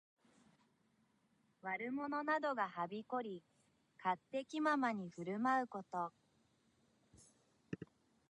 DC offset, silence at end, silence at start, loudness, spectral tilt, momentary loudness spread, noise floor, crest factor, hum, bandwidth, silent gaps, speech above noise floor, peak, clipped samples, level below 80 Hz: under 0.1%; 0.45 s; 1.65 s; -41 LUFS; -6 dB/octave; 15 LU; -78 dBFS; 20 dB; none; 10.5 kHz; none; 37 dB; -24 dBFS; under 0.1%; -84 dBFS